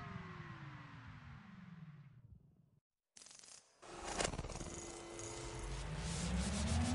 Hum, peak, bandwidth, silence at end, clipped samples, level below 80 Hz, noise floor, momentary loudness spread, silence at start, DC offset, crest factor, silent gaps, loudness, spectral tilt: none; -22 dBFS; 11.5 kHz; 0 s; under 0.1%; -52 dBFS; -65 dBFS; 20 LU; 0 s; under 0.1%; 22 dB; 2.81-2.90 s; -45 LUFS; -4.5 dB/octave